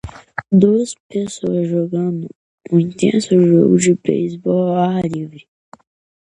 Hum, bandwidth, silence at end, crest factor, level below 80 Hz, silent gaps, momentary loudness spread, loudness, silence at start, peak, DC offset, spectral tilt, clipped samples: none; 11 kHz; 0.8 s; 16 dB; -50 dBFS; 1.00-1.10 s, 2.35-2.58 s; 15 LU; -16 LUFS; 0.05 s; 0 dBFS; under 0.1%; -7 dB/octave; under 0.1%